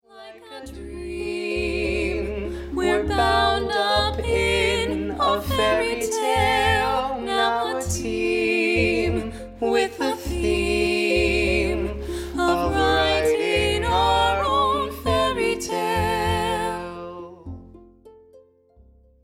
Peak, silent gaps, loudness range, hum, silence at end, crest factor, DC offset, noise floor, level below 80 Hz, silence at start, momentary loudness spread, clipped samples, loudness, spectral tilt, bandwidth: -8 dBFS; none; 4 LU; none; 0.85 s; 16 dB; under 0.1%; -54 dBFS; -36 dBFS; 0.15 s; 12 LU; under 0.1%; -22 LUFS; -4.5 dB/octave; 16.5 kHz